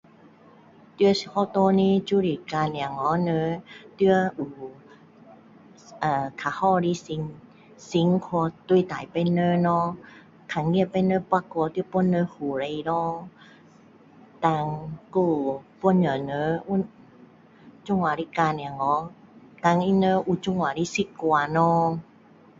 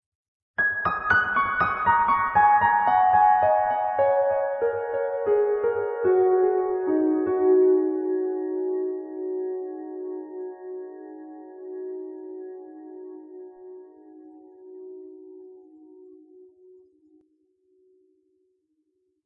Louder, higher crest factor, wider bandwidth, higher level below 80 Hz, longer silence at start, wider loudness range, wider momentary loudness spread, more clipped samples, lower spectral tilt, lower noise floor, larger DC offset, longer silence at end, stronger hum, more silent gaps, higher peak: about the same, -25 LUFS vs -23 LUFS; about the same, 20 dB vs 16 dB; first, 7.6 kHz vs 4.8 kHz; about the same, -60 dBFS vs -60 dBFS; first, 1 s vs 0.6 s; second, 4 LU vs 20 LU; second, 10 LU vs 23 LU; neither; second, -7 dB/octave vs -8.5 dB/octave; second, -53 dBFS vs -73 dBFS; neither; second, 0.6 s vs 3.7 s; neither; neither; about the same, -6 dBFS vs -8 dBFS